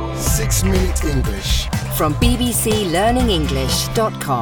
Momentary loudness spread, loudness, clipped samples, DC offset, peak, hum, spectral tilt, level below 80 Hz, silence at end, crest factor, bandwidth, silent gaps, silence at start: 4 LU; -18 LUFS; under 0.1%; under 0.1%; -2 dBFS; none; -4.5 dB/octave; -24 dBFS; 0 s; 16 dB; 18 kHz; none; 0 s